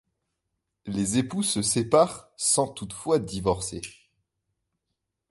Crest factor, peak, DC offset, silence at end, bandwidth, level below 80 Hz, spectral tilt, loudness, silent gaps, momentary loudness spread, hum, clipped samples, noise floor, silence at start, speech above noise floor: 22 dB; -6 dBFS; under 0.1%; 1.4 s; 12 kHz; -54 dBFS; -4 dB/octave; -25 LUFS; none; 13 LU; none; under 0.1%; -82 dBFS; 0.85 s; 56 dB